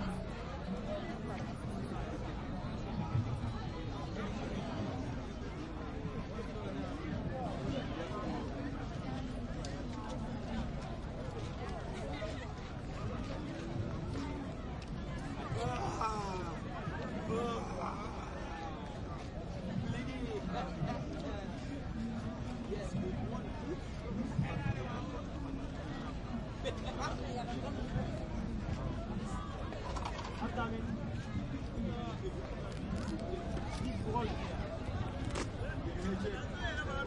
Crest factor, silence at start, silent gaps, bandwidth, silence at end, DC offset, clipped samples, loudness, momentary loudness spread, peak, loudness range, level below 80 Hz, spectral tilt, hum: 18 dB; 0 s; none; 11.5 kHz; 0 s; under 0.1%; under 0.1%; -41 LUFS; 5 LU; -22 dBFS; 3 LU; -46 dBFS; -6.5 dB/octave; none